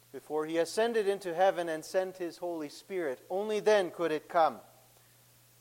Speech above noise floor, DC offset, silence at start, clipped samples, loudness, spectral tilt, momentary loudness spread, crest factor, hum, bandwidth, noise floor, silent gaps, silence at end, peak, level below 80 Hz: 31 dB; under 0.1%; 0.15 s; under 0.1%; -32 LUFS; -4 dB/octave; 10 LU; 18 dB; none; 16.5 kHz; -62 dBFS; none; 1 s; -14 dBFS; -80 dBFS